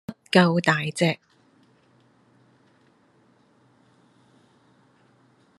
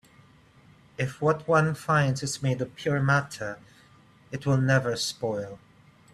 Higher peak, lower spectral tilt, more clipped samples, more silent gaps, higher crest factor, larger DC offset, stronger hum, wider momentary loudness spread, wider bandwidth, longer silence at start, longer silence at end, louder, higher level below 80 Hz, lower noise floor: first, -2 dBFS vs -10 dBFS; about the same, -5.5 dB/octave vs -5.5 dB/octave; neither; neither; first, 26 dB vs 18 dB; neither; neither; second, 6 LU vs 14 LU; about the same, 12.5 kHz vs 13 kHz; second, 0.1 s vs 1 s; first, 4.45 s vs 0.55 s; first, -22 LUFS vs -26 LUFS; second, -72 dBFS vs -60 dBFS; first, -61 dBFS vs -56 dBFS